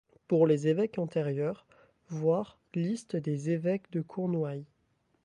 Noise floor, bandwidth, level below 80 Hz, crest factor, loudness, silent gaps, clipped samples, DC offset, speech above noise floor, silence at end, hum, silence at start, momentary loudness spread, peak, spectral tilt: -73 dBFS; 10.5 kHz; -74 dBFS; 18 dB; -31 LUFS; none; under 0.1%; under 0.1%; 43 dB; 0.6 s; none; 0.3 s; 11 LU; -12 dBFS; -8 dB/octave